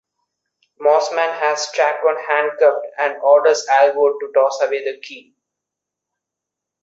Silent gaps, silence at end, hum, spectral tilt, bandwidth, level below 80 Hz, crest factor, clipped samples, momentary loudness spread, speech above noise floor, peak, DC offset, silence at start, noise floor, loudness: none; 1.65 s; none; -0.5 dB/octave; 7.8 kHz; -74 dBFS; 16 dB; under 0.1%; 8 LU; 67 dB; -2 dBFS; under 0.1%; 0.8 s; -83 dBFS; -16 LUFS